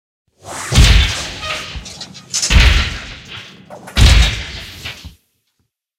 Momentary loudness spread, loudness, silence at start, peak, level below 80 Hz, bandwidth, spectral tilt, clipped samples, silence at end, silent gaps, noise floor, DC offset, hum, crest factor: 21 LU; -14 LUFS; 0.45 s; 0 dBFS; -18 dBFS; 15.5 kHz; -3 dB/octave; under 0.1%; 0.9 s; none; -68 dBFS; under 0.1%; none; 16 dB